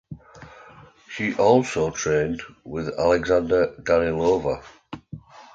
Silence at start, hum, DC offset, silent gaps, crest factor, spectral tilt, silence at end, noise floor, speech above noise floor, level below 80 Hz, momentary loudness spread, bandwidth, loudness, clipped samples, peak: 0.1 s; none; under 0.1%; none; 18 dB; -5.5 dB/octave; 0.1 s; -48 dBFS; 27 dB; -48 dBFS; 22 LU; 7.8 kHz; -22 LUFS; under 0.1%; -4 dBFS